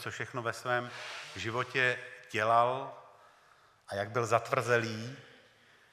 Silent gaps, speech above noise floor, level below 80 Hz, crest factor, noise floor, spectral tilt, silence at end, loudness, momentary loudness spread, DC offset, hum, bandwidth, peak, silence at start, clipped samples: none; 31 dB; -76 dBFS; 22 dB; -63 dBFS; -4.5 dB/octave; 0.65 s; -32 LUFS; 14 LU; under 0.1%; none; 15.5 kHz; -12 dBFS; 0 s; under 0.1%